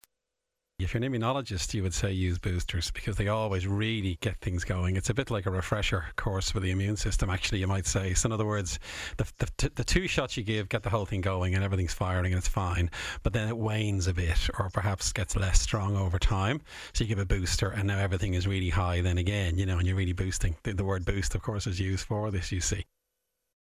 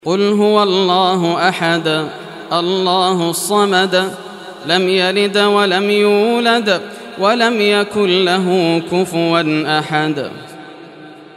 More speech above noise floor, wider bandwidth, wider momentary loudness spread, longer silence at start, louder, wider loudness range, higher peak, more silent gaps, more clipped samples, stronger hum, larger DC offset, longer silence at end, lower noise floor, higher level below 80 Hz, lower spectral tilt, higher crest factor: first, 57 dB vs 22 dB; about the same, 15 kHz vs 14 kHz; second, 4 LU vs 11 LU; first, 0.8 s vs 0.05 s; second, -30 LUFS vs -14 LUFS; about the same, 2 LU vs 2 LU; second, -10 dBFS vs 0 dBFS; neither; neither; neither; neither; first, 0.75 s vs 0.1 s; first, -86 dBFS vs -36 dBFS; first, -36 dBFS vs -64 dBFS; about the same, -4.5 dB/octave vs -4.5 dB/octave; first, 20 dB vs 14 dB